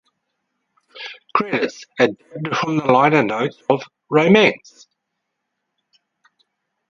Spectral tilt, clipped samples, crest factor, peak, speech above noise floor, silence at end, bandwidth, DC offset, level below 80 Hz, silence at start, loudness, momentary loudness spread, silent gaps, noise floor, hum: -6 dB/octave; under 0.1%; 20 dB; 0 dBFS; 60 dB; 2.35 s; 7.4 kHz; under 0.1%; -66 dBFS; 0.95 s; -18 LUFS; 17 LU; none; -77 dBFS; none